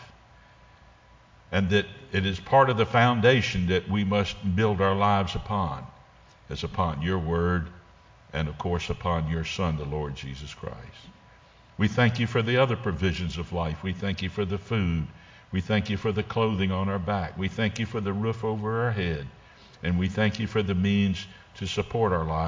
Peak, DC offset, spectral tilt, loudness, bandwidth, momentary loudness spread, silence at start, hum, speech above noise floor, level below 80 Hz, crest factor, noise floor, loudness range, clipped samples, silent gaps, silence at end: -6 dBFS; under 0.1%; -6.5 dB/octave; -26 LUFS; 7.6 kHz; 13 LU; 0 s; none; 29 dB; -42 dBFS; 20 dB; -55 dBFS; 7 LU; under 0.1%; none; 0 s